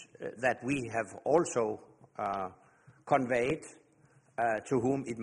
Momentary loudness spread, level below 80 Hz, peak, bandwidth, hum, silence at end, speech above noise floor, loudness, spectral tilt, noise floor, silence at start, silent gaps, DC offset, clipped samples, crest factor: 15 LU; -66 dBFS; -14 dBFS; 11.5 kHz; none; 0 s; 33 dB; -32 LUFS; -5.5 dB/octave; -65 dBFS; 0 s; none; under 0.1%; under 0.1%; 20 dB